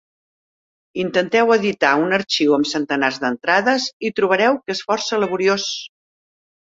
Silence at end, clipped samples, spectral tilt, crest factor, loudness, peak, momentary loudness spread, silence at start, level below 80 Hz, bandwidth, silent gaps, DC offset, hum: 0.8 s; under 0.1%; -3.5 dB/octave; 20 dB; -18 LUFS; 0 dBFS; 7 LU; 0.95 s; -64 dBFS; 7.8 kHz; 3.93-4.00 s; under 0.1%; none